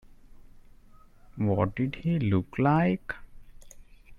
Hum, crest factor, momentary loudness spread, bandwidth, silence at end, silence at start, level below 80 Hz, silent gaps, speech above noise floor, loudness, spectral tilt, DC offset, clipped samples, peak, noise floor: none; 18 dB; 10 LU; 11 kHz; 0.05 s; 0.35 s; -52 dBFS; none; 27 dB; -27 LUFS; -9 dB/octave; under 0.1%; under 0.1%; -12 dBFS; -53 dBFS